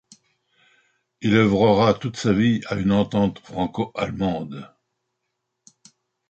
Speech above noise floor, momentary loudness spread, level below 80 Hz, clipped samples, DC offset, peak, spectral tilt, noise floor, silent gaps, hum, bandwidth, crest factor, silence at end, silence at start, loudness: 58 dB; 11 LU; -50 dBFS; under 0.1%; under 0.1%; -4 dBFS; -7 dB/octave; -78 dBFS; none; none; 8.2 kHz; 20 dB; 1.65 s; 1.2 s; -21 LUFS